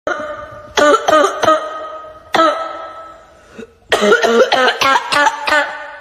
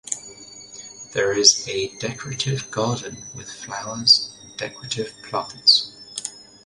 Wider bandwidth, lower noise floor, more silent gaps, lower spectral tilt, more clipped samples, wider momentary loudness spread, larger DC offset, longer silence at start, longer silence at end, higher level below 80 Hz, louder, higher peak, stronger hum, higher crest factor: first, 15.5 kHz vs 11.5 kHz; about the same, -40 dBFS vs -42 dBFS; neither; about the same, -2.5 dB/octave vs -2 dB/octave; neither; second, 18 LU vs 21 LU; neither; about the same, 0.05 s vs 0.05 s; second, 0 s vs 0.25 s; first, -52 dBFS vs -60 dBFS; first, -13 LUFS vs -20 LUFS; about the same, 0 dBFS vs 0 dBFS; neither; second, 14 dB vs 24 dB